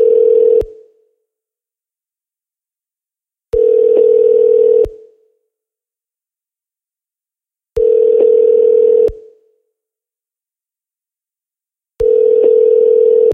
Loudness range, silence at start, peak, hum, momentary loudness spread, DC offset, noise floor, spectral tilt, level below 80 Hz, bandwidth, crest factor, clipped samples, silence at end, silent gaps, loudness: 8 LU; 0 s; -2 dBFS; none; 7 LU; under 0.1%; -90 dBFS; -8.5 dB/octave; -42 dBFS; 3.1 kHz; 12 dB; under 0.1%; 0 s; none; -11 LUFS